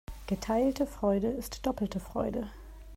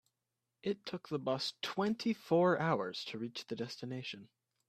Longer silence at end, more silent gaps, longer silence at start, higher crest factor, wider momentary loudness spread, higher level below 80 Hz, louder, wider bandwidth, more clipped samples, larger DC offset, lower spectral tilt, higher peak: second, 0 s vs 0.45 s; neither; second, 0.1 s vs 0.65 s; about the same, 16 dB vs 20 dB; second, 9 LU vs 12 LU; first, -46 dBFS vs -78 dBFS; first, -32 LUFS vs -37 LUFS; first, 16 kHz vs 14.5 kHz; neither; neither; about the same, -6.5 dB/octave vs -5.5 dB/octave; about the same, -16 dBFS vs -18 dBFS